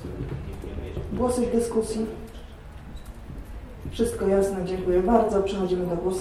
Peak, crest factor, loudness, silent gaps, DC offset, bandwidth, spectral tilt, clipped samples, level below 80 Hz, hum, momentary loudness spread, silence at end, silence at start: -6 dBFS; 20 dB; -25 LUFS; none; under 0.1%; 14.5 kHz; -6.5 dB/octave; under 0.1%; -40 dBFS; none; 21 LU; 0 s; 0 s